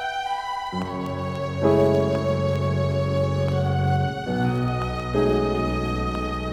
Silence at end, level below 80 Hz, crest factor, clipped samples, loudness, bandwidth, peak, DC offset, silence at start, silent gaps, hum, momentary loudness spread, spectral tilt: 0 s; -38 dBFS; 16 dB; under 0.1%; -24 LUFS; 11.5 kHz; -8 dBFS; under 0.1%; 0 s; none; none; 8 LU; -7.5 dB/octave